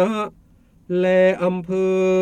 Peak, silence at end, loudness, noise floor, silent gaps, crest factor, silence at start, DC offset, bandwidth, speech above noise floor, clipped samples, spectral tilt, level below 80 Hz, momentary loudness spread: -6 dBFS; 0 s; -19 LUFS; -53 dBFS; none; 14 dB; 0 s; under 0.1%; 9.4 kHz; 35 dB; under 0.1%; -7 dB/octave; -56 dBFS; 10 LU